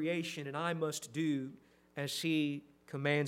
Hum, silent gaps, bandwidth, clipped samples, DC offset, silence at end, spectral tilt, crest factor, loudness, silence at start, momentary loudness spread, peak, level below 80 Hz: none; none; 16 kHz; under 0.1%; under 0.1%; 0 s; -5 dB/octave; 18 dB; -37 LUFS; 0 s; 12 LU; -18 dBFS; -80 dBFS